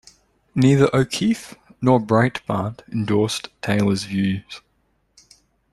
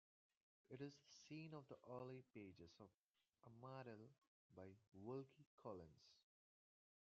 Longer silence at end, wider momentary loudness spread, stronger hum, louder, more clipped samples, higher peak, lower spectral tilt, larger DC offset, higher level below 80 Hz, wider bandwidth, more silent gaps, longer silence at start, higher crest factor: first, 1.15 s vs 0.85 s; about the same, 12 LU vs 10 LU; neither; first, -20 LUFS vs -60 LUFS; neither; first, -2 dBFS vs -42 dBFS; about the same, -6 dB/octave vs -6 dB/octave; neither; first, -52 dBFS vs under -90 dBFS; first, 13 kHz vs 7 kHz; second, none vs 2.99-3.14 s, 4.27-4.50 s, 4.88-4.92 s, 5.46-5.58 s; second, 0.55 s vs 0.7 s; about the same, 18 dB vs 20 dB